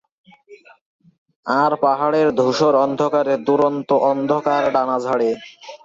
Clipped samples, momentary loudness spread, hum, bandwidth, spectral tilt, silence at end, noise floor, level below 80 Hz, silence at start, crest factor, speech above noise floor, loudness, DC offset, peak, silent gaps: under 0.1%; 5 LU; none; 7.8 kHz; -6 dB/octave; 0.1 s; -47 dBFS; -64 dBFS; 0.5 s; 16 dB; 29 dB; -18 LUFS; under 0.1%; -4 dBFS; 0.81-0.99 s, 1.18-1.26 s, 1.36-1.43 s